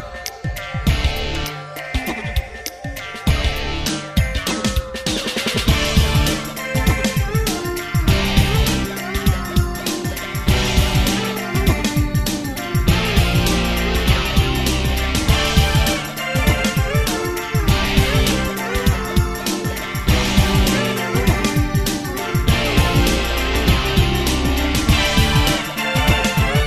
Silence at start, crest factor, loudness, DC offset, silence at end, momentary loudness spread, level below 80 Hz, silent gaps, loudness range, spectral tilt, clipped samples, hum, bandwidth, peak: 0 s; 18 dB; -18 LUFS; under 0.1%; 0 s; 7 LU; -22 dBFS; none; 5 LU; -4.5 dB/octave; under 0.1%; none; 15.5 kHz; 0 dBFS